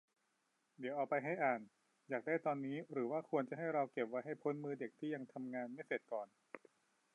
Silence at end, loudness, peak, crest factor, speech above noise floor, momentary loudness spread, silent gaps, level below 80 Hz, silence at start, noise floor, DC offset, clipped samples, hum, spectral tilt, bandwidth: 0.55 s; -42 LUFS; -24 dBFS; 20 dB; 41 dB; 8 LU; none; under -90 dBFS; 0.8 s; -83 dBFS; under 0.1%; under 0.1%; none; -8 dB/octave; 10.5 kHz